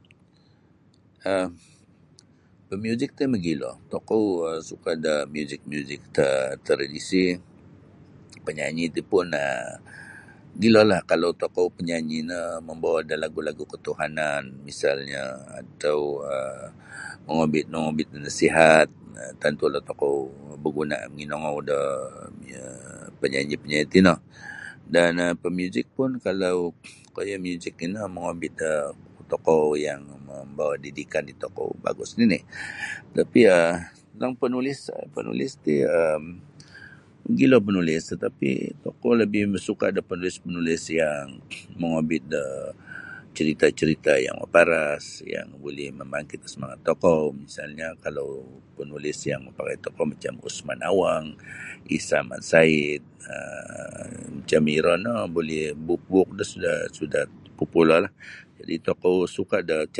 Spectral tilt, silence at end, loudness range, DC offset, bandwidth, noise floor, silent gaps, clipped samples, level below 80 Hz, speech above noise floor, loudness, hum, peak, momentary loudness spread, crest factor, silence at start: -5.5 dB/octave; 0 s; 6 LU; under 0.1%; 11.5 kHz; -58 dBFS; none; under 0.1%; -56 dBFS; 34 dB; -24 LUFS; none; 0 dBFS; 18 LU; 24 dB; 1.25 s